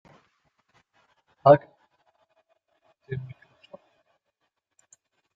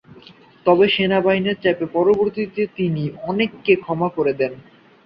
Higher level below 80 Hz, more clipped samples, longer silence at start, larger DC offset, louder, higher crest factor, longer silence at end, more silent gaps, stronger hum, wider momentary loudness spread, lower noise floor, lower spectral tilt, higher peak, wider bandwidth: second, -68 dBFS vs -56 dBFS; neither; first, 1.45 s vs 0.65 s; neither; second, -22 LUFS vs -19 LUFS; first, 26 dB vs 18 dB; first, 2.15 s vs 0.45 s; neither; neither; first, 20 LU vs 8 LU; first, -79 dBFS vs -46 dBFS; about the same, -8.5 dB/octave vs -9 dB/octave; about the same, -4 dBFS vs -2 dBFS; first, 7.6 kHz vs 5.4 kHz